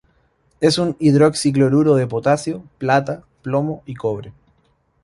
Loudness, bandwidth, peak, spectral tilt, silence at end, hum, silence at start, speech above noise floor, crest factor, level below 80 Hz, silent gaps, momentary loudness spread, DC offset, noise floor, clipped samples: -18 LUFS; 11.5 kHz; -2 dBFS; -6 dB/octave; 0.75 s; none; 0.6 s; 45 dB; 16 dB; -54 dBFS; none; 12 LU; under 0.1%; -62 dBFS; under 0.1%